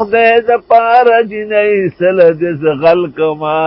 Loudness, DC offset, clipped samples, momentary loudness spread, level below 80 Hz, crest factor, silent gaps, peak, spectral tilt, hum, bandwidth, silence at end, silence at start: -10 LUFS; under 0.1%; under 0.1%; 6 LU; -50 dBFS; 10 dB; none; 0 dBFS; -8.5 dB/octave; none; 5.8 kHz; 0 s; 0 s